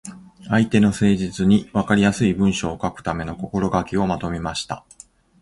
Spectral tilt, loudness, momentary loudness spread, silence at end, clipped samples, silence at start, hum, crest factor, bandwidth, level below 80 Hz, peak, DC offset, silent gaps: -6 dB/octave; -20 LUFS; 10 LU; 0.6 s; under 0.1%; 0.05 s; none; 18 dB; 11.5 kHz; -42 dBFS; -2 dBFS; under 0.1%; none